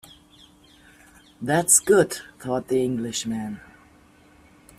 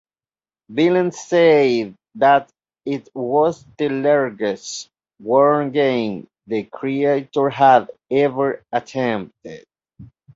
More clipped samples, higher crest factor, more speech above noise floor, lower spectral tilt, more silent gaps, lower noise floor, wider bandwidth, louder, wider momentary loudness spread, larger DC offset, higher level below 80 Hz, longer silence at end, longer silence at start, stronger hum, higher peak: neither; first, 24 dB vs 18 dB; second, 32 dB vs over 72 dB; second, -3.5 dB/octave vs -5.5 dB/octave; neither; second, -54 dBFS vs under -90 dBFS; first, 15.5 kHz vs 8 kHz; second, -21 LUFS vs -18 LUFS; first, 18 LU vs 15 LU; neither; about the same, -60 dBFS vs -64 dBFS; first, 1.2 s vs 0.3 s; first, 1.4 s vs 0.7 s; neither; about the same, 0 dBFS vs -2 dBFS